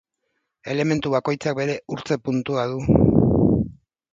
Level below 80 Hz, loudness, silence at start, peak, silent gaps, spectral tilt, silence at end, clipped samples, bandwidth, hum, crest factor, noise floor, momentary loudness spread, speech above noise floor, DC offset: -38 dBFS; -21 LUFS; 0.65 s; 0 dBFS; none; -7.5 dB/octave; 0.45 s; under 0.1%; 7.8 kHz; none; 20 dB; -75 dBFS; 11 LU; 54 dB; under 0.1%